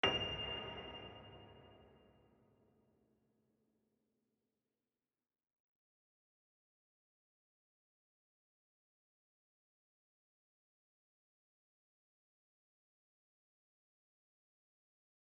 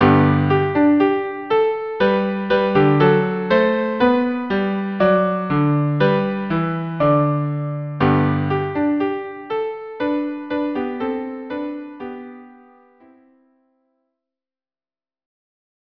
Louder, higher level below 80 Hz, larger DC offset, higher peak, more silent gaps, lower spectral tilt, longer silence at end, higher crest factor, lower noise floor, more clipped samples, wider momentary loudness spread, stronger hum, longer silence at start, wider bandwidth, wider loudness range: second, -42 LUFS vs -19 LUFS; second, -72 dBFS vs -52 dBFS; neither; second, -20 dBFS vs -2 dBFS; neither; second, -1 dB/octave vs -10 dB/octave; first, 13.3 s vs 3.5 s; first, 34 dB vs 18 dB; about the same, under -90 dBFS vs under -90 dBFS; neither; first, 23 LU vs 12 LU; neither; about the same, 0.05 s vs 0 s; first, 6 kHz vs 5.4 kHz; first, 22 LU vs 12 LU